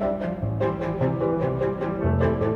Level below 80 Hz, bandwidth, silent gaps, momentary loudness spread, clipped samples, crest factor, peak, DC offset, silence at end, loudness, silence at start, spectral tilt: -40 dBFS; 6.4 kHz; none; 4 LU; under 0.1%; 14 dB; -10 dBFS; under 0.1%; 0 s; -25 LUFS; 0 s; -10 dB/octave